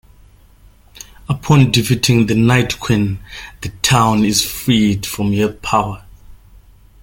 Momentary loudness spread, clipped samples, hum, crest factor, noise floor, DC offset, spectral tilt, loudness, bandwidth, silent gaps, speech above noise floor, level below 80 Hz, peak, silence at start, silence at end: 15 LU; under 0.1%; none; 16 dB; -46 dBFS; under 0.1%; -5 dB/octave; -15 LUFS; 17 kHz; none; 31 dB; -40 dBFS; 0 dBFS; 1.3 s; 0.7 s